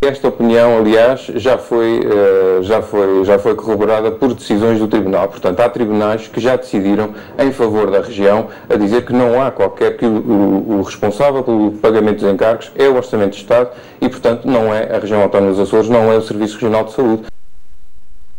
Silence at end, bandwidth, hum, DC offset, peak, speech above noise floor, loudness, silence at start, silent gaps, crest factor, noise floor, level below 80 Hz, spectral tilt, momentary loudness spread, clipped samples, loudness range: 0 s; 16.5 kHz; none; under 0.1%; -2 dBFS; 32 dB; -13 LUFS; 0 s; none; 12 dB; -45 dBFS; -46 dBFS; -7 dB/octave; 6 LU; under 0.1%; 2 LU